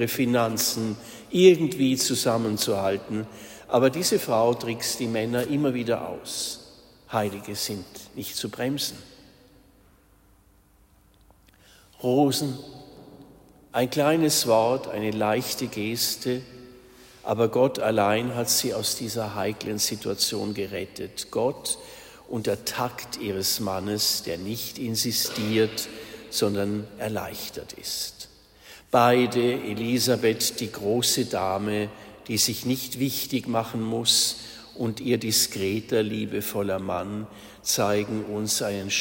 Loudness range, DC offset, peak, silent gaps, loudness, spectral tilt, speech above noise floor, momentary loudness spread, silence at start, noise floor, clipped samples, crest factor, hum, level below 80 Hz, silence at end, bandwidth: 7 LU; under 0.1%; -4 dBFS; none; -25 LUFS; -3.5 dB/octave; 33 dB; 12 LU; 0 s; -59 dBFS; under 0.1%; 22 dB; none; -60 dBFS; 0 s; 16.5 kHz